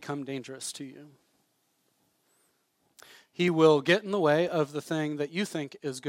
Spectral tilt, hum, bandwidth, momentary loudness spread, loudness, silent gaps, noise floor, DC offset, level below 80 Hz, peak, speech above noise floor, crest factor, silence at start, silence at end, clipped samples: -5 dB/octave; none; 16 kHz; 16 LU; -28 LUFS; none; -73 dBFS; under 0.1%; -80 dBFS; -8 dBFS; 45 dB; 22 dB; 0 s; 0 s; under 0.1%